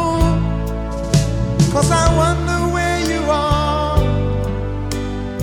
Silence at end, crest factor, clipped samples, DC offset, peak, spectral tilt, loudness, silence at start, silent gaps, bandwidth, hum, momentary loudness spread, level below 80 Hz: 0 s; 16 dB; under 0.1%; under 0.1%; 0 dBFS; -5.5 dB/octave; -18 LUFS; 0 s; none; 16.5 kHz; none; 9 LU; -24 dBFS